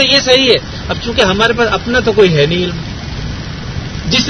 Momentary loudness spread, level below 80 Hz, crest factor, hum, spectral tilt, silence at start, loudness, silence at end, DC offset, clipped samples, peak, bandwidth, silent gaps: 15 LU; -30 dBFS; 12 dB; none; -4 dB/octave; 0 s; -12 LUFS; 0 s; under 0.1%; 0.2%; 0 dBFS; 11 kHz; none